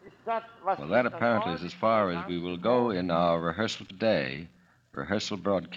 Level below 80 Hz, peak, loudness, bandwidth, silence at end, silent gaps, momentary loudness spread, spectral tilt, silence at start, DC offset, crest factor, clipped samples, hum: -62 dBFS; -10 dBFS; -28 LUFS; 8 kHz; 0 s; none; 8 LU; -6 dB/octave; 0.05 s; under 0.1%; 18 dB; under 0.1%; none